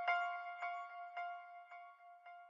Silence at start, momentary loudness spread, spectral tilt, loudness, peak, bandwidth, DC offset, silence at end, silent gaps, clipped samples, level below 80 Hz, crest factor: 0 s; 19 LU; 6 dB/octave; -45 LUFS; -24 dBFS; 7.4 kHz; under 0.1%; 0 s; none; under 0.1%; under -90 dBFS; 20 dB